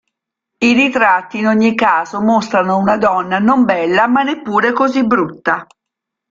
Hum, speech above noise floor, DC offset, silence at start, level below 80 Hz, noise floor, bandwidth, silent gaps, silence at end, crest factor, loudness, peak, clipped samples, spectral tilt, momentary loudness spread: none; 67 dB; under 0.1%; 0.6 s; -54 dBFS; -80 dBFS; 7.6 kHz; none; 0.65 s; 14 dB; -13 LUFS; 0 dBFS; under 0.1%; -5.5 dB/octave; 4 LU